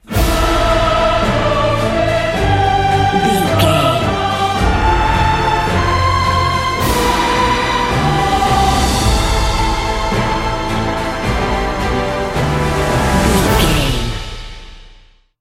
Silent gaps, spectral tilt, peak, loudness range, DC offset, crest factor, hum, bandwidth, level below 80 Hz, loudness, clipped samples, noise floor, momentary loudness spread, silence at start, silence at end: none; -5 dB/octave; 0 dBFS; 3 LU; under 0.1%; 14 dB; none; 16.5 kHz; -22 dBFS; -14 LUFS; under 0.1%; -45 dBFS; 5 LU; 0.1 s; 0.45 s